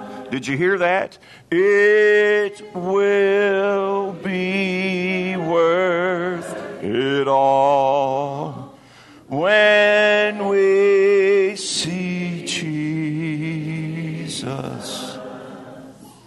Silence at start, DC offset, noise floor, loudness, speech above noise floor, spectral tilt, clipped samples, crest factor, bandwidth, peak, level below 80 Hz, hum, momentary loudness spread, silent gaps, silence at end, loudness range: 0 s; under 0.1%; -46 dBFS; -18 LUFS; 28 dB; -5 dB/octave; under 0.1%; 14 dB; 12 kHz; -4 dBFS; -64 dBFS; none; 15 LU; none; 0.15 s; 9 LU